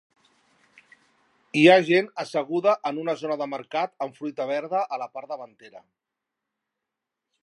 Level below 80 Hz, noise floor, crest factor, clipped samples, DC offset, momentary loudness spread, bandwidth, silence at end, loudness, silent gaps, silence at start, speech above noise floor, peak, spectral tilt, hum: -82 dBFS; -85 dBFS; 22 dB; under 0.1%; under 0.1%; 18 LU; 11.5 kHz; 1.65 s; -24 LUFS; none; 1.55 s; 61 dB; -4 dBFS; -5.5 dB/octave; none